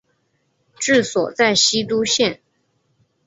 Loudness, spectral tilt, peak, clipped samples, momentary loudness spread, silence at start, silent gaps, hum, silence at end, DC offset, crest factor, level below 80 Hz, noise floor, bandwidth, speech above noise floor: -17 LUFS; -2 dB/octave; -2 dBFS; under 0.1%; 8 LU; 0.8 s; none; none; 0.9 s; under 0.1%; 18 dB; -60 dBFS; -67 dBFS; 8 kHz; 49 dB